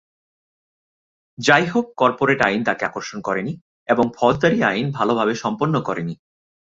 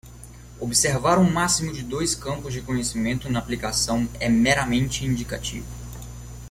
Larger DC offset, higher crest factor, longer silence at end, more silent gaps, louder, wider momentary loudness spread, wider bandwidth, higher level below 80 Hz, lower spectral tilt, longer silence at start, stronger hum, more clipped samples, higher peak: neither; about the same, 20 dB vs 18 dB; first, 0.55 s vs 0 s; first, 3.61-3.86 s vs none; first, -19 LUFS vs -23 LUFS; second, 11 LU vs 19 LU; second, 7.8 kHz vs 16.5 kHz; second, -54 dBFS vs -40 dBFS; first, -5.5 dB/octave vs -4 dB/octave; first, 1.4 s vs 0.05 s; second, none vs 60 Hz at -35 dBFS; neither; first, -2 dBFS vs -6 dBFS